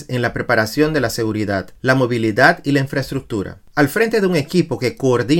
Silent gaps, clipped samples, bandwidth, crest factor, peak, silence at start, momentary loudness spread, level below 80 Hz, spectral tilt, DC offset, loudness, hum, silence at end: none; under 0.1%; 17 kHz; 18 dB; 0 dBFS; 0 s; 10 LU; -44 dBFS; -6 dB/octave; under 0.1%; -17 LUFS; none; 0 s